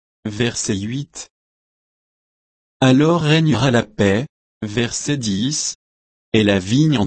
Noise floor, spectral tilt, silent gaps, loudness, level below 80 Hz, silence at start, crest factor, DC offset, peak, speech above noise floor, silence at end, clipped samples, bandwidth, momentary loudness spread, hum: under -90 dBFS; -5 dB/octave; 1.30-2.80 s, 4.29-4.61 s, 5.75-6.32 s; -18 LUFS; -50 dBFS; 0.25 s; 18 dB; under 0.1%; -2 dBFS; over 73 dB; 0 s; under 0.1%; 8.8 kHz; 17 LU; none